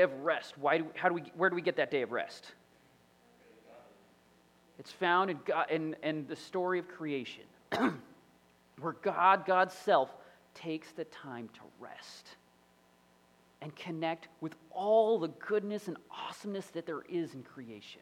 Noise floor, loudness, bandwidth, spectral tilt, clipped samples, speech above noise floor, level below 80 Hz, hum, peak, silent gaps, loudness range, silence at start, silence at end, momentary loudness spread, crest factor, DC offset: -66 dBFS; -33 LUFS; 16 kHz; -5.5 dB/octave; under 0.1%; 32 dB; -82 dBFS; none; -12 dBFS; none; 12 LU; 0 s; 0.05 s; 21 LU; 24 dB; under 0.1%